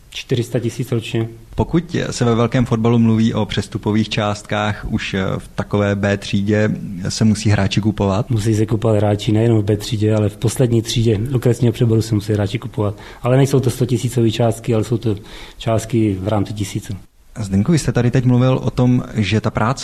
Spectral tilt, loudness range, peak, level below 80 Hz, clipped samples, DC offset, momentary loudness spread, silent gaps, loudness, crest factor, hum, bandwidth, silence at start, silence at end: -6.5 dB/octave; 3 LU; -4 dBFS; -38 dBFS; under 0.1%; under 0.1%; 8 LU; none; -18 LUFS; 14 dB; none; 14 kHz; 0.1 s; 0 s